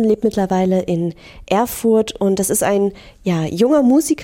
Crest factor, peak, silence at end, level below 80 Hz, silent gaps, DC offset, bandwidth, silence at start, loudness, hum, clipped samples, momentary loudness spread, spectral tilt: 12 dB; -4 dBFS; 0 s; -46 dBFS; none; under 0.1%; 16.5 kHz; 0 s; -17 LUFS; none; under 0.1%; 8 LU; -5.5 dB/octave